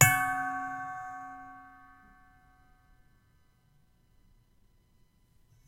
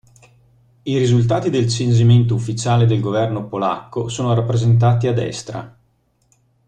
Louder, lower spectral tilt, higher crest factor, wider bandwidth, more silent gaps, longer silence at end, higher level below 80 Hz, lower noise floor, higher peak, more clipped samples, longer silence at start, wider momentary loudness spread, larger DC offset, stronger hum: second, -32 LUFS vs -17 LUFS; second, -2.5 dB/octave vs -7 dB/octave; first, 32 dB vs 14 dB; first, 16 kHz vs 9.2 kHz; neither; first, 3.95 s vs 1 s; second, -60 dBFS vs -48 dBFS; first, -66 dBFS vs -62 dBFS; about the same, -4 dBFS vs -4 dBFS; neither; second, 0 s vs 0.85 s; first, 26 LU vs 11 LU; neither; neither